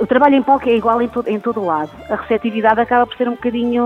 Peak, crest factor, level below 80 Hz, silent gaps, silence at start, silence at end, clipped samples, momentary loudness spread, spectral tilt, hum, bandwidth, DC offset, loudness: 0 dBFS; 16 dB; -48 dBFS; none; 0 s; 0 s; under 0.1%; 8 LU; -7.5 dB/octave; none; 6 kHz; under 0.1%; -16 LUFS